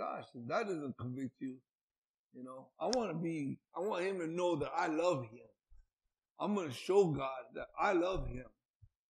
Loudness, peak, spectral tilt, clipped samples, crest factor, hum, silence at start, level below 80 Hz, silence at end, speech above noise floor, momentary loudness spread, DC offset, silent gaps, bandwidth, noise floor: -37 LUFS; -16 dBFS; -6 dB/octave; under 0.1%; 22 dB; none; 0 s; -58 dBFS; 0.6 s; over 53 dB; 14 LU; under 0.1%; 1.75-1.88 s, 1.98-2.30 s, 5.93-5.97 s, 6.31-6.35 s; 12 kHz; under -90 dBFS